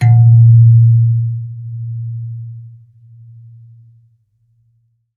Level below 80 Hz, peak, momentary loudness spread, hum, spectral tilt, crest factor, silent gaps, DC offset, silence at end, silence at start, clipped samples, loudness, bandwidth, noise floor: -58 dBFS; -2 dBFS; 20 LU; none; -10 dB/octave; 12 dB; none; under 0.1%; 2.5 s; 0 s; under 0.1%; -10 LUFS; 2.2 kHz; -59 dBFS